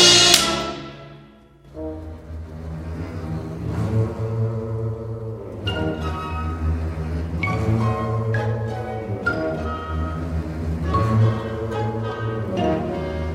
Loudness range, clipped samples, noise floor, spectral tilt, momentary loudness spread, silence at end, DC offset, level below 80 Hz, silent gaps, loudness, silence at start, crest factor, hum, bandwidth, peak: 5 LU; under 0.1%; -47 dBFS; -4 dB/octave; 13 LU; 0 s; under 0.1%; -34 dBFS; none; -23 LUFS; 0 s; 22 dB; none; 16 kHz; 0 dBFS